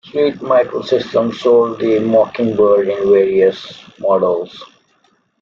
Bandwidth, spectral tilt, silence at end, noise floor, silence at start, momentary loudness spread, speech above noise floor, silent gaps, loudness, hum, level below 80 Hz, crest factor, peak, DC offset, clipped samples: 7.2 kHz; -7 dB/octave; 0.75 s; -58 dBFS; 0.15 s; 8 LU; 45 dB; none; -14 LUFS; none; -56 dBFS; 14 dB; -2 dBFS; under 0.1%; under 0.1%